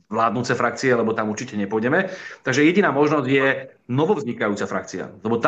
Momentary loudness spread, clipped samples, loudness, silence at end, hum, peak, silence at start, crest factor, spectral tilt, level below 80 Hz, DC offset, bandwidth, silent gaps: 10 LU; under 0.1%; -21 LUFS; 0 s; none; -4 dBFS; 0.1 s; 18 dB; -5.5 dB/octave; -66 dBFS; under 0.1%; 8.4 kHz; none